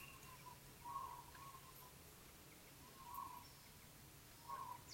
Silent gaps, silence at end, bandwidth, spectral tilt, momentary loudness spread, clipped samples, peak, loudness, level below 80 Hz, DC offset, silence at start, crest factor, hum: none; 0 s; 16.5 kHz; -3 dB/octave; 9 LU; under 0.1%; -38 dBFS; -56 LUFS; -72 dBFS; under 0.1%; 0 s; 18 dB; none